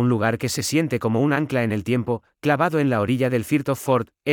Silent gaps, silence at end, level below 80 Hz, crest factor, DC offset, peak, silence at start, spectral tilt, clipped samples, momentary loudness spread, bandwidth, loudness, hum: none; 0 s; -60 dBFS; 16 dB; under 0.1%; -6 dBFS; 0 s; -6 dB/octave; under 0.1%; 4 LU; 19.5 kHz; -22 LUFS; none